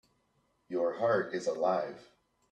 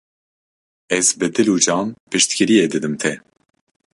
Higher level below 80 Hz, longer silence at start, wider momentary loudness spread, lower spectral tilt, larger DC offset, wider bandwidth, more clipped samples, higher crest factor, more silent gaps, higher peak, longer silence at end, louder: second, -78 dBFS vs -60 dBFS; second, 0.7 s vs 0.9 s; first, 11 LU vs 8 LU; first, -5.5 dB/octave vs -3 dB/octave; neither; second, 9.6 kHz vs 11.5 kHz; neither; about the same, 18 dB vs 18 dB; second, none vs 2.00-2.07 s; second, -16 dBFS vs -2 dBFS; second, 0.5 s vs 0.8 s; second, -32 LUFS vs -17 LUFS